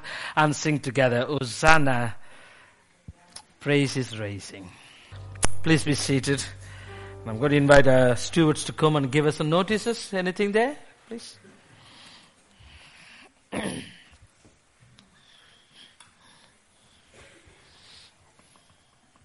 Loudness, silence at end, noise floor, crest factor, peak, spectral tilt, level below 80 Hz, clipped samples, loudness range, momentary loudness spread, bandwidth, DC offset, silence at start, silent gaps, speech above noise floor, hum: -23 LUFS; 0 s; -61 dBFS; 26 dB; 0 dBFS; -5 dB/octave; -46 dBFS; under 0.1%; 19 LU; 24 LU; 11.5 kHz; under 0.1%; 0.05 s; none; 39 dB; none